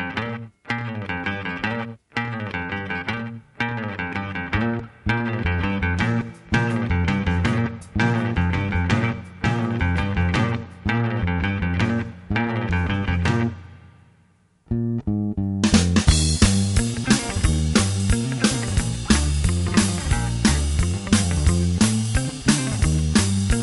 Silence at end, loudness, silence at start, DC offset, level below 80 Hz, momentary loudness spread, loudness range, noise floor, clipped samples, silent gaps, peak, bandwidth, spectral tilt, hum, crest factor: 0 s; -22 LUFS; 0 s; under 0.1%; -30 dBFS; 9 LU; 7 LU; -59 dBFS; under 0.1%; none; -2 dBFS; 11.5 kHz; -5 dB/octave; none; 20 dB